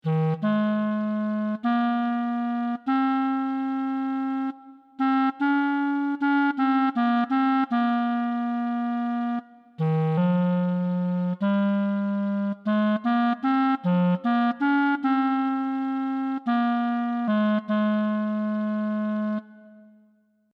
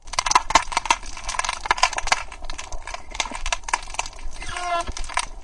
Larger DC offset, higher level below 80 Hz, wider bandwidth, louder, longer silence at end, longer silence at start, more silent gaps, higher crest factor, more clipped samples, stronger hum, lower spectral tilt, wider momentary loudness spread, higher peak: neither; second, -82 dBFS vs -34 dBFS; second, 5.4 kHz vs 11.5 kHz; about the same, -25 LUFS vs -23 LUFS; first, 0.75 s vs 0 s; about the same, 0.05 s vs 0.05 s; neither; second, 12 dB vs 24 dB; neither; neither; first, -9.5 dB/octave vs -0.5 dB/octave; second, 5 LU vs 15 LU; second, -12 dBFS vs 0 dBFS